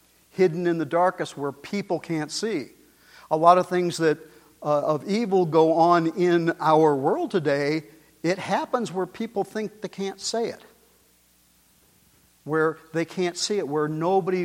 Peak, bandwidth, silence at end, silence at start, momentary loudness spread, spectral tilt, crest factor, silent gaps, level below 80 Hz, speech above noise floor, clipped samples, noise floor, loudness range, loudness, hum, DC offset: -2 dBFS; 16 kHz; 0 s; 0.35 s; 13 LU; -5.5 dB/octave; 22 dB; none; -70 dBFS; 38 dB; under 0.1%; -61 dBFS; 10 LU; -24 LUFS; none; under 0.1%